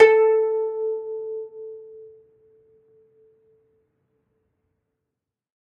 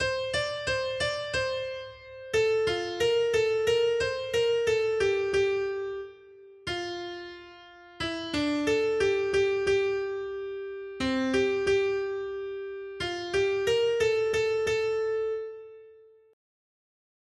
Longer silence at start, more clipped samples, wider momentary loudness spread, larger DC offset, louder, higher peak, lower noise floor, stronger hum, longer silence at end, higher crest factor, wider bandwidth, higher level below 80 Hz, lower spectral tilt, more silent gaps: about the same, 0 s vs 0 s; neither; first, 24 LU vs 12 LU; neither; first, -22 LUFS vs -28 LUFS; first, -2 dBFS vs -14 dBFS; first, -84 dBFS vs -54 dBFS; neither; first, 3.7 s vs 1.4 s; first, 22 dB vs 14 dB; second, 5.2 kHz vs 12.5 kHz; second, -76 dBFS vs -56 dBFS; about the same, -3.5 dB/octave vs -4 dB/octave; neither